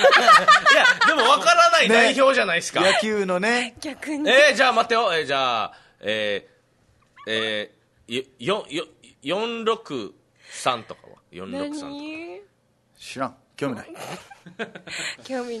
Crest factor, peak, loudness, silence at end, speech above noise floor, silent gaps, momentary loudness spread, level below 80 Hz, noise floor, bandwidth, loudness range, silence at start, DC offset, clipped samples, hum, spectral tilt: 20 dB; -2 dBFS; -19 LUFS; 0 s; 40 dB; none; 21 LU; -66 dBFS; -63 dBFS; 12.5 kHz; 17 LU; 0 s; under 0.1%; under 0.1%; none; -2.5 dB/octave